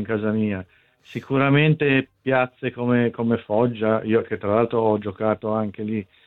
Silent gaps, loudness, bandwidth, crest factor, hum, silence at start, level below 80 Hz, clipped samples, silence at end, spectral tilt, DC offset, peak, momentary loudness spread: none; -22 LUFS; 4.3 kHz; 18 dB; none; 0 s; -62 dBFS; under 0.1%; 0.25 s; -9.5 dB/octave; under 0.1%; -4 dBFS; 9 LU